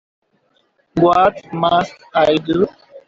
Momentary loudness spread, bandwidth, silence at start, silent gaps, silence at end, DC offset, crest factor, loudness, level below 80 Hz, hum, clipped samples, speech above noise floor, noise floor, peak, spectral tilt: 8 LU; 7.6 kHz; 0.95 s; none; 0.1 s; under 0.1%; 16 dB; -16 LUFS; -52 dBFS; none; under 0.1%; 46 dB; -62 dBFS; -2 dBFS; -6.5 dB/octave